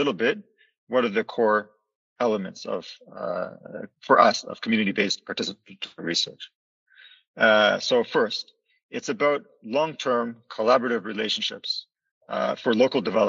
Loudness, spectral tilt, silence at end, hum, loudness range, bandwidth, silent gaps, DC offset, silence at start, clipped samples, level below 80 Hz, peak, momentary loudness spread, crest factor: -24 LUFS; -4 dB/octave; 0 s; none; 3 LU; 7.8 kHz; 0.78-0.87 s, 1.95-2.16 s, 6.55-6.86 s, 7.27-7.34 s, 8.83-8.89 s, 12.11-12.21 s; under 0.1%; 0 s; under 0.1%; -74 dBFS; -2 dBFS; 15 LU; 22 dB